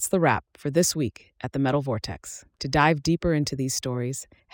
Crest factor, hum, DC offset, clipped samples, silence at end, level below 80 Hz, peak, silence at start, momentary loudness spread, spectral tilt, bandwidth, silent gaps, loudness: 18 dB; none; under 0.1%; under 0.1%; 0.3 s; -48 dBFS; -8 dBFS; 0 s; 13 LU; -4.5 dB/octave; 17 kHz; none; -25 LUFS